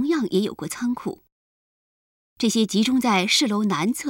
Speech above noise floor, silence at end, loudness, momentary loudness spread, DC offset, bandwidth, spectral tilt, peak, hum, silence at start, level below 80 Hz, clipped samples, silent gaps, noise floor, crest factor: over 68 dB; 0 s; -22 LUFS; 10 LU; under 0.1%; 17 kHz; -4 dB/octave; -8 dBFS; none; 0 s; -64 dBFS; under 0.1%; 1.32-2.36 s; under -90 dBFS; 16 dB